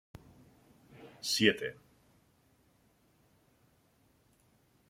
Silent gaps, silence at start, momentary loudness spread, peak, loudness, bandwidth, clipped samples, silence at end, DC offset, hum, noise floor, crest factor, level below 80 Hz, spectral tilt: none; 1 s; 29 LU; -10 dBFS; -31 LUFS; 16.5 kHz; under 0.1%; 3.15 s; under 0.1%; none; -70 dBFS; 30 dB; -72 dBFS; -3 dB/octave